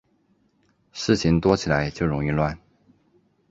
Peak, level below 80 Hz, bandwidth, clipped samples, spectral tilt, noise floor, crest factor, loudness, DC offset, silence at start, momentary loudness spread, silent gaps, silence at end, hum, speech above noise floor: -4 dBFS; -42 dBFS; 7.8 kHz; under 0.1%; -6 dB/octave; -65 dBFS; 22 dB; -23 LUFS; under 0.1%; 0.95 s; 12 LU; none; 0.95 s; none; 43 dB